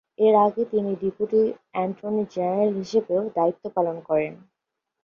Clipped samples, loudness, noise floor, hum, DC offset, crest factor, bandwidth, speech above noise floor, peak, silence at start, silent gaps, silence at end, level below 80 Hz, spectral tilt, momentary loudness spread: under 0.1%; -24 LUFS; -83 dBFS; none; under 0.1%; 16 dB; 7 kHz; 60 dB; -6 dBFS; 0.2 s; none; 0.7 s; -66 dBFS; -7.5 dB/octave; 8 LU